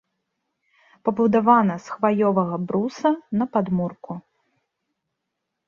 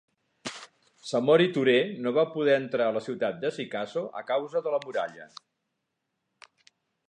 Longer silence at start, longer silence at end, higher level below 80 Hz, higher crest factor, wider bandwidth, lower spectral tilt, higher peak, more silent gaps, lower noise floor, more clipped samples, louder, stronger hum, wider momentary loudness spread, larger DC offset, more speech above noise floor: first, 1.05 s vs 0.45 s; second, 1.45 s vs 1.85 s; first, -64 dBFS vs -80 dBFS; about the same, 20 dB vs 20 dB; second, 7.2 kHz vs 10.5 kHz; first, -8 dB/octave vs -5.5 dB/octave; first, -4 dBFS vs -8 dBFS; neither; about the same, -80 dBFS vs -81 dBFS; neither; first, -21 LUFS vs -27 LUFS; neither; second, 12 LU vs 18 LU; neither; first, 59 dB vs 55 dB